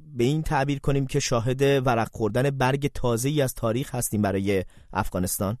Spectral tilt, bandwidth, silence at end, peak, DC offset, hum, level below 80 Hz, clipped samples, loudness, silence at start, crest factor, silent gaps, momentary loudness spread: -5.5 dB/octave; 14 kHz; 0.05 s; -8 dBFS; under 0.1%; none; -40 dBFS; under 0.1%; -25 LUFS; 0 s; 16 dB; none; 5 LU